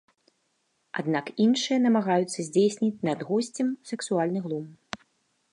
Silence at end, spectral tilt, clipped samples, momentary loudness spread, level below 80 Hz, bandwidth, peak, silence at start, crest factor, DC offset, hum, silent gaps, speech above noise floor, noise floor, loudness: 0.55 s; -5 dB/octave; under 0.1%; 13 LU; -76 dBFS; 11 kHz; -12 dBFS; 0.95 s; 16 dB; under 0.1%; none; none; 48 dB; -73 dBFS; -26 LUFS